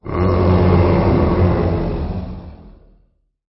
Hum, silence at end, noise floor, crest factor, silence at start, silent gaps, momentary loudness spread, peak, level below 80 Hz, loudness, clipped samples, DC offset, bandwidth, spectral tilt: none; 0.8 s; -57 dBFS; 12 dB; 0.05 s; none; 14 LU; -4 dBFS; -26 dBFS; -16 LUFS; under 0.1%; under 0.1%; 5.8 kHz; -13 dB/octave